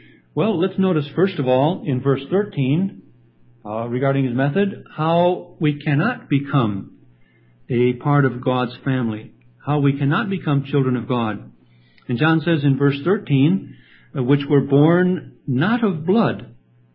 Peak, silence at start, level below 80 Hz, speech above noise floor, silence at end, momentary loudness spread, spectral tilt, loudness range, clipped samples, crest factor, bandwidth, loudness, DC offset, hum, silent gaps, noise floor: -2 dBFS; 0.35 s; -58 dBFS; 35 dB; 0.45 s; 9 LU; -12.5 dB/octave; 3 LU; under 0.1%; 18 dB; 5.2 kHz; -20 LUFS; under 0.1%; none; none; -53 dBFS